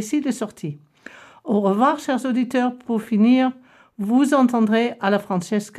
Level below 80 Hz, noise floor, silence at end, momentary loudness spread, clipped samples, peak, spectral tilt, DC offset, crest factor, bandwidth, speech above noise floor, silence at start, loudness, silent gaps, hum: -70 dBFS; -44 dBFS; 0 s; 13 LU; under 0.1%; -6 dBFS; -6 dB/octave; under 0.1%; 14 dB; 14 kHz; 25 dB; 0 s; -20 LUFS; none; none